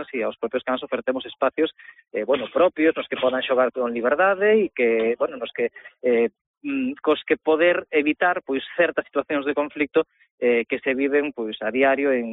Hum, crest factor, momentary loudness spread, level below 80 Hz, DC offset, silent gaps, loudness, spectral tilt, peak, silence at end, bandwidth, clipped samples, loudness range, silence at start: none; 16 dB; 9 LU; -66 dBFS; under 0.1%; 6.41-6.61 s, 10.31-10.38 s; -22 LUFS; -2 dB/octave; -6 dBFS; 0 s; 4 kHz; under 0.1%; 2 LU; 0 s